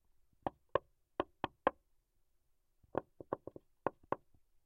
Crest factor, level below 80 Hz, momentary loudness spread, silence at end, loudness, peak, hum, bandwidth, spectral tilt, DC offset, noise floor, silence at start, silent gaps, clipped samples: 30 dB; -70 dBFS; 8 LU; 0.5 s; -43 LUFS; -14 dBFS; none; 5 kHz; -8 dB/octave; under 0.1%; -76 dBFS; 0.45 s; none; under 0.1%